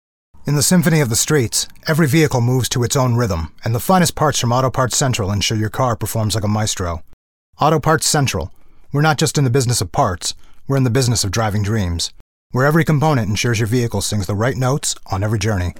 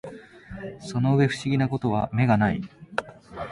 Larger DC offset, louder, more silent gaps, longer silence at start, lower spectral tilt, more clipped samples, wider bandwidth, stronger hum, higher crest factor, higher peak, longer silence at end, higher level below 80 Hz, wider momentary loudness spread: neither; first, -17 LUFS vs -24 LUFS; first, 7.13-7.53 s, 12.20-12.50 s vs none; first, 0.35 s vs 0.05 s; second, -4.5 dB/octave vs -7.5 dB/octave; neither; first, 18 kHz vs 11.5 kHz; neither; about the same, 16 dB vs 18 dB; first, -2 dBFS vs -8 dBFS; about the same, 0 s vs 0 s; first, -38 dBFS vs -52 dBFS; second, 8 LU vs 20 LU